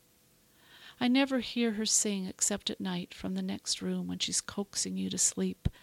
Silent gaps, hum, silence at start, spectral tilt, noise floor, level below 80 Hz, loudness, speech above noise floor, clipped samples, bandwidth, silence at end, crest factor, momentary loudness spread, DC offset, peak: none; none; 0.7 s; -3 dB/octave; -65 dBFS; -52 dBFS; -31 LUFS; 33 dB; under 0.1%; 16.5 kHz; 0.1 s; 20 dB; 9 LU; under 0.1%; -14 dBFS